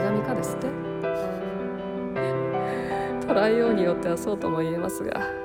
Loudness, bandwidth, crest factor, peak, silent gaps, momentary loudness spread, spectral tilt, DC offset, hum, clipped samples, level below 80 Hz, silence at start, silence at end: -26 LUFS; 17 kHz; 14 dB; -10 dBFS; none; 9 LU; -6.5 dB/octave; under 0.1%; none; under 0.1%; -54 dBFS; 0 s; 0 s